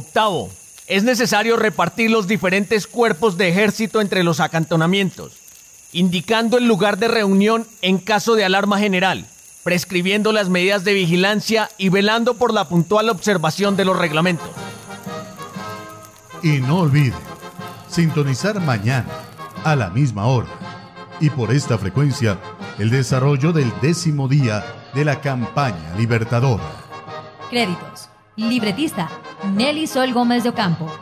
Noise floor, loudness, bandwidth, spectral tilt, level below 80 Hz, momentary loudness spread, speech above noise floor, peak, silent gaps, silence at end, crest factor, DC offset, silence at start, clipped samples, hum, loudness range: -44 dBFS; -18 LUFS; 16 kHz; -5.5 dB/octave; -48 dBFS; 16 LU; 26 dB; -4 dBFS; none; 0 s; 14 dB; under 0.1%; 0 s; under 0.1%; none; 5 LU